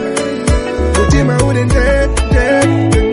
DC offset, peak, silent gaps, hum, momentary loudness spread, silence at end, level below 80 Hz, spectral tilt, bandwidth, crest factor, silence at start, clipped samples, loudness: under 0.1%; 0 dBFS; none; none; 4 LU; 0 s; -16 dBFS; -6 dB/octave; 11.5 kHz; 12 dB; 0 s; under 0.1%; -12 LUFS